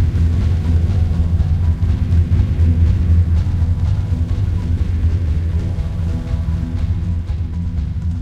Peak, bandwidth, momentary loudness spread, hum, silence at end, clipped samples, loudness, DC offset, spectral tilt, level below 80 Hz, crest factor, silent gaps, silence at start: -4 dBFS; 5.6 kHz; 7 LU; none; 0 s; under 0.1%; -18 LUFS; under 0.1%; -9 dB/octave; -20 dBFS; 12 dB; none; 0 s